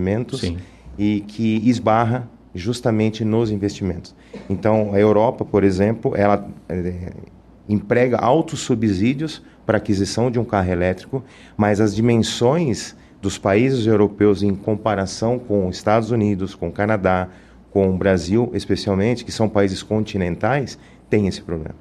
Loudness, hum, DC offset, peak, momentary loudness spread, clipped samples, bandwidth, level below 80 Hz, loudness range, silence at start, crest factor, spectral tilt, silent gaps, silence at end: -20 LUFS; none; under 0.1%; -4 dBFS; 12 LU; under 0.1%; 12 kHz; -46 dBFS; 2 LU; 0 s; 16 dB; -6.5 dB/octave; none; 0.05 s